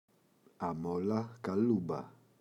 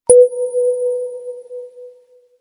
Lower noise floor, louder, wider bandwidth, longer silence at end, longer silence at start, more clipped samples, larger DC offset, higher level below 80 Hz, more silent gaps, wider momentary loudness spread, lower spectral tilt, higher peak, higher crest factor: first, -68 dBFS vs -49 dBFS; second, -35 LUFS vs -15 LUFS; about the same, 10.5 kHz vs 11 kHz; second, 0.3 s vs 0.5 s; first, 0.6 s vs 0.1 s; neither; neither; second, -70 dBFS vs -54 dBFS; neither; second, 10 LU vs 23 LU; first, -9 dB/octave vs -4 dB/octave; second, -20 dBFS vs 0 dBFS; about the same, 16 dB vs 16 dB